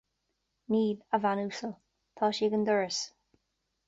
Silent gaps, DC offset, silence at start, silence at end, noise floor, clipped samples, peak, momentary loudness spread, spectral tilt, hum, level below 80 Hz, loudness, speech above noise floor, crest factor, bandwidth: none; under 0.1%; 0.7 s; 0.8 s; -81 dBFS; under 0.1%; -14 dBFS; 10 LU; -4.5 dB/octave; none; -76 dBFS; -30 LUFS; 51 dB; 18 dB; 7.8 kHz